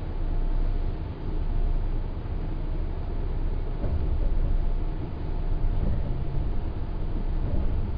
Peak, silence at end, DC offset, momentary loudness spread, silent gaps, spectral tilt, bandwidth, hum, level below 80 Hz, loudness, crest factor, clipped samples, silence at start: -14 dBFS; 0 s; under 0.1%; 4 LU; none; -10.5 dB/octave; 4.9 kHz; none; -26 dBFS; -32 LUFS; 12 dB; under 0.1%; 0 s